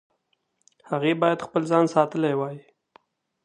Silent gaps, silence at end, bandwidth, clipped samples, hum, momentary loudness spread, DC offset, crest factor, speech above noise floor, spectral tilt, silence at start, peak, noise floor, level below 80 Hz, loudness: none; 0.85 s; 10 kHz; under 0.1%; none; 11 LU; under 0.1%; 20 dB; 50 dB; -6.5 dB/octave; 0.9 s; -4 dBFS; -73 dBFS; -74 dBFS; -23 LUFS